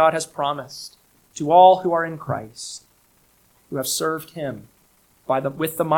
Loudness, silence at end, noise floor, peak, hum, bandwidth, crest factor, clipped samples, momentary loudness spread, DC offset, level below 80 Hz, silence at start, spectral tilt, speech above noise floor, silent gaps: -21 LUFS; 0 s; -59 dBFS; -2 dBFS; none; 18.5 kHz; 20 dB; under 0.1%; 24 LU; under 0.1%; -62 dBFS; 0 s; -4 dB/octave; 39 dB; none